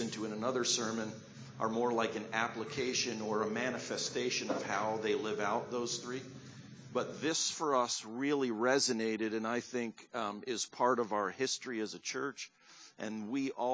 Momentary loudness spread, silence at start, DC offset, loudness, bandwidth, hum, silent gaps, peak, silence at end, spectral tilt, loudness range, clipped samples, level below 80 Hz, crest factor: 11 LU; 0 s; under 0.1%; -35 LUFS; 8 kHz; none; none; -16 dBFS; 0 s; -3 dB/octave; 3 LU; under 0.1%; -78 dBFS; 20 dB